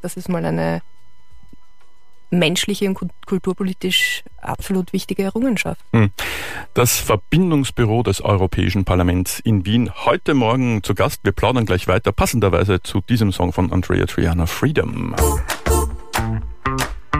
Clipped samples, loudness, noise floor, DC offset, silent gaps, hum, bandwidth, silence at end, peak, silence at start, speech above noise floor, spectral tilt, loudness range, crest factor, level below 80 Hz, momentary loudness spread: under 0.1%; -19 LUFS; -54 dBFS; 2%; none; none; 15.5 kHz; 0 s; -4 dBFS; 0.05 s; 36 dB; -5 dB/octave; 3 LU; 16 dB; -32 dBFS; 7 LU